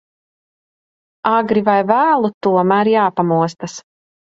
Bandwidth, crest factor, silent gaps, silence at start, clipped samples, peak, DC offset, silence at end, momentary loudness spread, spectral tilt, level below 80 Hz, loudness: 7.8 kHz; 16 dB; 2.34-2.41 s; 1.25 s; under 0.1%; 0 dBFS; under 0.1%; 0.55 s; 10 LU; -6.5 dB/octave; -62 dBFS; -15 LUFS